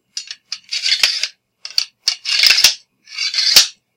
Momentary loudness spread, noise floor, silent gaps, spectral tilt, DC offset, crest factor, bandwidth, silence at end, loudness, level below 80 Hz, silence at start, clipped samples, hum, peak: 19 LU; -38 dBFS; none; 3.5 dB/octave; under 0.1%; 18 dB; over 20 kHz; 0.25 s; -13 LUFS; -58 dBFS; 0.15 s; 0.2%; none; 0 dBFS